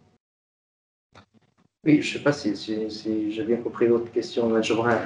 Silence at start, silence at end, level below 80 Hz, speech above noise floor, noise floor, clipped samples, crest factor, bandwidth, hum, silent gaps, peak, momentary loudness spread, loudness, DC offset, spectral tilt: 1.15 s; 0 s; -68 dBFS; 40 dB; -63 dBFS; under 0.1%; 18 dB; 10 kHz; none; none; -8 dBFS; 7 LU; -24 LUFS; under 0.1%; -6 dB/octave